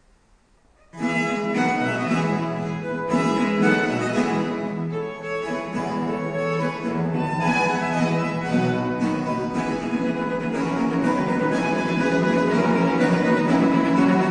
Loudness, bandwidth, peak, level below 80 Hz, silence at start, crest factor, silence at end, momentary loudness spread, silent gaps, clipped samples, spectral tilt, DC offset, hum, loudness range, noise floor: -22 LUFS; 10 kHz; -6 dBFS; -54 dBFS; 0.95 s; 16 dB; 0 s; 8 LU; none; under 0.1%; -6.5 dB/octave; under 0.1%; none; 4 LU; -58 dBFS